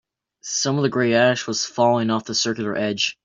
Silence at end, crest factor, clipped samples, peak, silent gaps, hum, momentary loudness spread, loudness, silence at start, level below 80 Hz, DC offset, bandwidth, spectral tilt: 0.1 s; 18 dB; under 0.1%; -4 dBFS; none; none; 7 LU; -20 LUFS; 0.45 s; -64 dBFS; under 0.1%; 7.8 kHz; -3.5 dB/octave